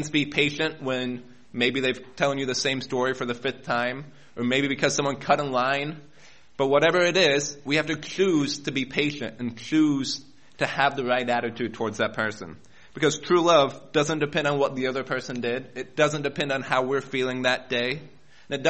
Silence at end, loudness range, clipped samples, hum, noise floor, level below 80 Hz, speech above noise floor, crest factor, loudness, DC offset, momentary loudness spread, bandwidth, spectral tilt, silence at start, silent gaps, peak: 0 s; 3 LU; under 0.1%; none; -55 dBFS; -62 dBFS; 30 dB; 20 dB; -25 LUFS; 0.3%; 11 LU; 8.4 kHz; -4 dB/octave; 0 s; none; -6 dBFS